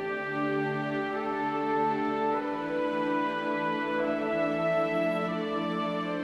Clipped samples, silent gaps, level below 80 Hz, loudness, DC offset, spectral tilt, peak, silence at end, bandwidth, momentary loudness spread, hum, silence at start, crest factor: under 0.1%; none; -64 dBFS; -29 LUFS; under 0.1%; -7 dB/octave; -16 dBFS; 0 s; 12 kHz; 3 LU; none; 0 s; 12 dB